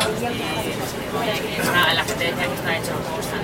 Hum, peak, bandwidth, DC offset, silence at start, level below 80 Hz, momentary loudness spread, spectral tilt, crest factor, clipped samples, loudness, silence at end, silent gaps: none; -4 dBFS; 16.5 kHz; under 0.1%; 0 s; -46 dBFS; 8 LU; -3.5 dB/octave; 18 dB; under 0.1%; -22 LUFS; 0 s; none